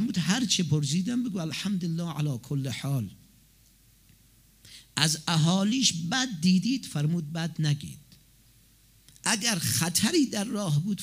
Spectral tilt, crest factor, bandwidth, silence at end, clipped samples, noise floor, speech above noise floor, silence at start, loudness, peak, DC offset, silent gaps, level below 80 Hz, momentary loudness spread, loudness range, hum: -4 dB/octave; 24 dB; 16 kHz; 0 s; under 0.1%; -59 dBFS; 33 dB; 0 s; -27 LUFS; -4 dBFS; under 0.1%; none; -64 dBFS; 8 LU; 7 LU; none